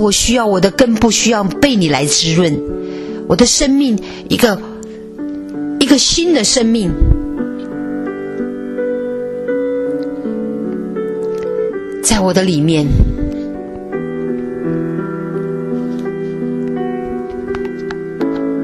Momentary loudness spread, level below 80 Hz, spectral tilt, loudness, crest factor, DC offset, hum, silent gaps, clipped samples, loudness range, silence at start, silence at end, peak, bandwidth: 12 LU; -26 dBFS; -4 dB/octave; -15 LUFS; 16 dB; under 0.1%; none; none; under 0.1%; 7 LU; 0 s; 0 s; 0 dBFS; 13.5 kHz